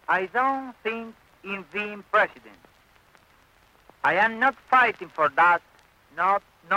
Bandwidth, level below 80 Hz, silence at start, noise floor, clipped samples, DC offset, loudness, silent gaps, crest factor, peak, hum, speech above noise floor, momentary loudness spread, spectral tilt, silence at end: 16 kHz; -68 dBFS; 0.1 s; -59 dBFS; under 0.1%; under 0.1%; -24 LUFS; none; 16 dB; -8 dBFS; none; 35 dB; 15 LU; -5 dB/octave; 0 s